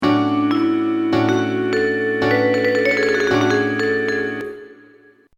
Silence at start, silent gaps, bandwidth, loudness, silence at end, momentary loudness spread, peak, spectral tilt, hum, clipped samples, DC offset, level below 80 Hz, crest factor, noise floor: 0 s; none; 11.5 kHz; -18 LUFS; 0.65 s; 5 LU; -4 dBFS; -6 dB/octave; none; under 0.1%; under 0.1%; -54 dBFS; 14 dB; -50 dBFS